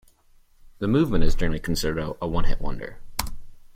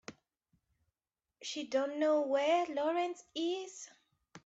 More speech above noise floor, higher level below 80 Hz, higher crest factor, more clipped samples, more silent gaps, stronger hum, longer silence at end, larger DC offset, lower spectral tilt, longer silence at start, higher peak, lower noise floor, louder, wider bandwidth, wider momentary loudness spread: second, 37 dB vs over 56 dB; first, -28 dBFS vs -84 dBFS; about the same, 16 dB vs 16 dB; neither; neither; neither; about the same, 0.1 s vs 0.05 s; neither; first, -5.5 dB/octave vs -2.5 dB/octave; first, 0.8 s vs 0.1 s; first, -6 dBFS vs -20 dBFS; second, -56 dBFS vs under -90 dBFS; first, -27 LUFS vs -34 LUFS; first, 15.5 kHz vs 8.2 kHz; second, 12 LU vs 17 LU